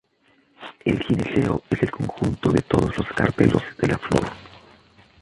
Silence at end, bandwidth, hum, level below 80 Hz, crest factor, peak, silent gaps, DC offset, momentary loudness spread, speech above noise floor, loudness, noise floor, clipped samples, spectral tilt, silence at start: 0.65 s; 11.5 kHz; none; -42 dBFS; 20 dB; -2 dBFS; none; under 0.1%; 8 LU; 40 dB; -22 LUFS; -61 dBFS; under 0.1%; -7 dB/octave; 0.6 s